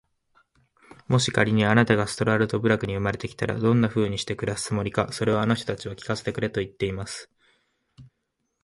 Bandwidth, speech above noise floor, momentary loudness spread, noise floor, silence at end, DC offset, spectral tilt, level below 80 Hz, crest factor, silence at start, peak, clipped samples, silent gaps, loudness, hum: 11.5 kHz; 53 dB; 10 LU; -77 dBFS; 0.6 s; under 0.1%; -5.5 dB/octave; -50 dBFS; 20 dB; 1.1 s; -4 dBFS; under 0.1%; none; -24 LUFS; none